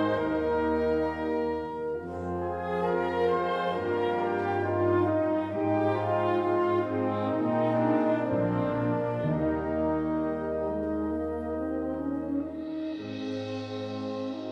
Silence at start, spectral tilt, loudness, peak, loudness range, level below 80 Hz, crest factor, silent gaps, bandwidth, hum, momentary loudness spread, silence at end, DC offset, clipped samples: 0 s; -8.5 dB/octave; -29 LUFS; -14 dBFS; 5 LU; -52 dBFS; 14 dB; none; 7.6 kHz; none; 8 LU; 0 s; under 0.1%; under 0.1%